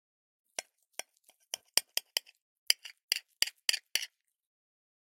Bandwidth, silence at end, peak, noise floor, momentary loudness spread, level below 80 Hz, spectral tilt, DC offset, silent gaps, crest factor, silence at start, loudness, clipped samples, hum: 16.5 kHz; 1.05 s; -2 dBFS; -69 dBFS; 15 LU; under -90 dBFS; 4 dB/octave; under 0.1%; 2.41-2.66 s, 3.03-3.09 s; 36 dB; 0.6 s; -33 LUFS; under 0.1%; none